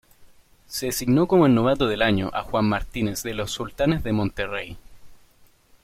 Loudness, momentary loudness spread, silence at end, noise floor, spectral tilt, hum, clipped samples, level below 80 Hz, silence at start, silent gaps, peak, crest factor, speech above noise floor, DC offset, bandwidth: -23 LUFS; 12 LU; 0.7 s; -55 dBFS; -5.5 dB/octave; none; under 0.1%; -42 dBFS; 0.2 s; none; -6 dBFS; 18 dB; 33 dB; under 0.1%; 16.5 kHz